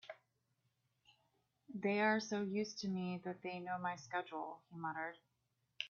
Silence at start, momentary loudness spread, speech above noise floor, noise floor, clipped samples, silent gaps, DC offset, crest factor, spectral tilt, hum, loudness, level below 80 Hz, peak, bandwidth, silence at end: 0.05 s; 13 LU; 43 dB; -84 dBFS; under 0.1%; none; under 0.1%; 20 dB; -4 dB/octave; none; -41 LUFS; -86 dBFS; -24 dBFS; 7.2 kHz; 0 s